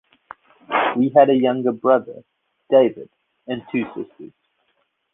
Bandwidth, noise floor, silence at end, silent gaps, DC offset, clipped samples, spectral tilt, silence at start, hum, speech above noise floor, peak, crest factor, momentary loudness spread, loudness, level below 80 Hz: 3.9 kHz; -69 dBFS; 0.85 s; none; under 0.1%; under 0.1%; -9.5 dB/octave; 0.7 s; none; 50 dB; -2 dBFS; 18 dB; 19 LU; -19 LUFS; -66 dBFS